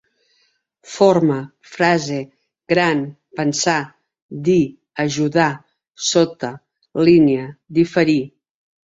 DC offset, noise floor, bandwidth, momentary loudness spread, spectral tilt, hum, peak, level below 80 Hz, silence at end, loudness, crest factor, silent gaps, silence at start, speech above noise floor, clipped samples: under 0.1%; -64 dBFS; 8 kHz; 16 LU; -5 dB/octave; none; -2 dBFS; -56 dBFS; 0.65 s; -18 LUFS; 18 dB; 4.22-4.29 s; 0.85 s; 47 dB; under 0.1%